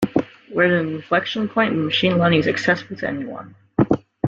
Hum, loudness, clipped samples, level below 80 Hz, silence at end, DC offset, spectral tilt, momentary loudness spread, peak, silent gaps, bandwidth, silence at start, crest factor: none; -20 LUFS; under 0.1%; -52 dBFS; 0 s; under 0.1%; -6.5 dB/octave; 10 LU; -2 dBFS; none; 7.8 kHz; 0 s; 18 dB